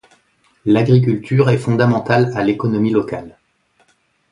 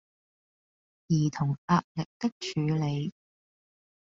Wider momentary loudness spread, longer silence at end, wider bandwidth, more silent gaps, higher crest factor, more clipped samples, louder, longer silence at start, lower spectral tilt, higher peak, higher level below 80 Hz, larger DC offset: about the same, 8 LU vs 7 LU; about the same, 1 s vs 1.05 s; first, 10.5 kHz vs 7.6 kHz; second, none vs 1.58-1.68 s, 1.84-1.95 s, 2.06-2.20 s, 2.32-2.41 s; about the same, 16 dB vs 20 dB; neither; first, -16 LUFS vs -30 LUFS; second, 0.65 s vs 1.1 s; first, -8.5 dB/octave vs -6.5 dB/octave; first, 0 dBFS vs -10 dBFS; first, -52 dBFS vs -64 dBFS; neither